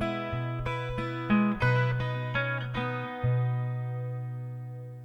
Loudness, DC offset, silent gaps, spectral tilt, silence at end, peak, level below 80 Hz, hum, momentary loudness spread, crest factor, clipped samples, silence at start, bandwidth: -30 LUFS; under 0.1%; none; -8.5 dB/octave; 0 s; -14 dBFS; -50 dBFS; 60 Hz at -55 dBFS; 11 LU; 16 dB; under 0.1%; 0 s; 6.2 kHz